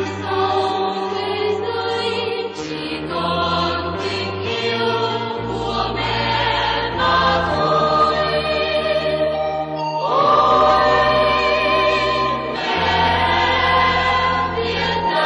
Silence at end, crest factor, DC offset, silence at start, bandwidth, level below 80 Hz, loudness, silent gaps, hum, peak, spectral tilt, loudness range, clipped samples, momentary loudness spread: 0 s; 14 dB; under 0.1%; 0 s; 10.5 kHz; -40 dBFS; -18 LUFS; none; none; -4 dBFS; -5 dB/octave; 6 LU; under 0.1%; 8 LU